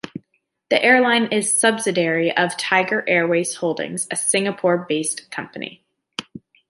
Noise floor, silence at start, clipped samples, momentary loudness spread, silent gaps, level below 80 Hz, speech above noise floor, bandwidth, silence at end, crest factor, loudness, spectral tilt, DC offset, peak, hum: -68 dBFS; 0.15 s; under 0.1%; 18 LU; none; -70 dBFS; 49 dB; 11.5 kHz; 0.3 s; 18 dB; -19 LUFS; -3 dB/octave; under 0.1%; -2 dBFS; none